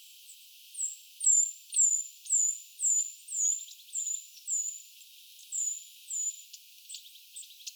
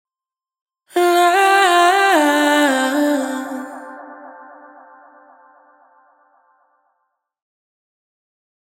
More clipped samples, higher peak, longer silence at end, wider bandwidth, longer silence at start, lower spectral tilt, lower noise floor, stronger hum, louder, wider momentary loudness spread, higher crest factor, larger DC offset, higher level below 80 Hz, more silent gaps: neither; second, -16 dBFS vs 0 dBFS; second, 0 s vs 4.2 s; about the same, over 20 kHz vs 18.5 kHz; second, 0 s vs 0.95 s; second, 11.5 dB/octave vs -0.5 dB/octave; second, -54 dBFS vs under -90 dBFS; neither; second, -29 LUFS vs -14 LUFS; first, 24 LU vs 21 LU; about the same, 18 dB vs 18 dB; neither; about the same, under -90 dBFS vs under -90 dBFS; neither